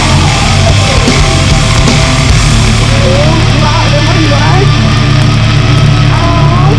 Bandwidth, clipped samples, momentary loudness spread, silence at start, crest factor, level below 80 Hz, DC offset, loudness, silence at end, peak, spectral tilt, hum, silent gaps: 11 kHz; 3%; 1 LU; 0 s; 6 dB; -14 dBFS; under 0.1%; -7 LUFS; 0 s; 0 dBFS; -5 dB/octave; none; none